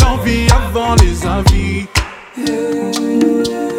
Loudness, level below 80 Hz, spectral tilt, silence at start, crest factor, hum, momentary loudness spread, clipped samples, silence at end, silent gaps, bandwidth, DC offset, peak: -14 LUFS; -18 dBFS; -5.5 dB/octave; 0 s; 12 dB; none; 6 LU; 0.6%; 0 s; none; 17.5 kHz; under 0.1%; 0 dBFS